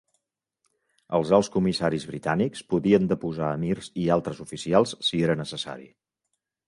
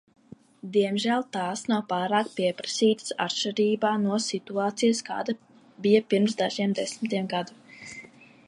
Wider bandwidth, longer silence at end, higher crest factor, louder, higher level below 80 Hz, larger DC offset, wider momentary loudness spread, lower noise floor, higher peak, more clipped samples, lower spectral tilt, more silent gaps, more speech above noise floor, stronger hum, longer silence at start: about the same, 11.5 kHz vs 11.5 kHz; first, 0.8 s vs 0.4 s; about the same, 20 dB vs 18 dB; about the same, -25 LUFS vs -26 LUFS; first, -56 dBFS vs -76 dBFS; neither; about the same, 11 LU vs 11 LU; first, -81 dBFS vs -48 dBFS; about the same, -6 dBFS vs -8 dBFS; neither; first, -6 dB/octave vs -4.5 dB/octave; neither; first, 56 dB vs 23 dB; neither; first, 1.1 s vs 0.65 s